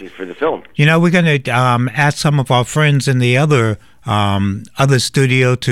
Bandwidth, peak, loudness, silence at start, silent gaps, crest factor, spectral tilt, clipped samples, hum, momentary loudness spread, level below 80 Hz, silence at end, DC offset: 13 kHz; -2 dBFS; -14 LUFS; 0 s; none; 12 dB; -5.5 dB/octave; under 0.1%; none; 8 LU; -48 dBFS; 0 s; under 0.1%